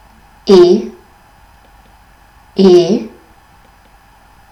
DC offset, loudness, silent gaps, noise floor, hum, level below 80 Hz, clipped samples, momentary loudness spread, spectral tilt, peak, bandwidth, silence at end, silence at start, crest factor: under 0.1%; -10 LUFS; none; -45 dBFS; none; -48 dBFS; 0.6%; 20 LU; -7 dB/octave; 0 dBFS; 8 kHz; 1.45 s; 0.45 s; 14 dB